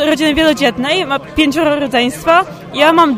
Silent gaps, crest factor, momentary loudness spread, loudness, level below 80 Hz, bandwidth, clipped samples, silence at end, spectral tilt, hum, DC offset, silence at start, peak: none; 12 dB; 4 LU; -13 LUFS; -38 dBFS; 16 kHz; under 0.1%; 0 s; -4 dB/octave; none; under 0.1%; 0 s; 0 dBFS